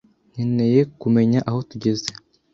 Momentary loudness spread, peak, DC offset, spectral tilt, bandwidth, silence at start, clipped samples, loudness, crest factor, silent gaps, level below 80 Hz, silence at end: 10 LU; -6 dBFS; under 0.1%; -7 dB/octave; 7.6 kHz; 0.35 s; under 0.1%; -20 LUFS; 16 dB; none; -56 dBFS; 0.4 s